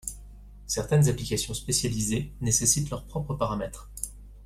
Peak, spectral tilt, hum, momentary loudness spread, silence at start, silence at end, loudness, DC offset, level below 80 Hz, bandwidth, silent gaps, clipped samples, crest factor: -8 dBFS; -4 dB/octave; 50 Hz at -40 dBFS; 14 LU; 0.05 s; 0 s; -27 LUFS; under 0.1%; -44 dBFS; 15.5 kHz; none; under 0.1%; 20 dB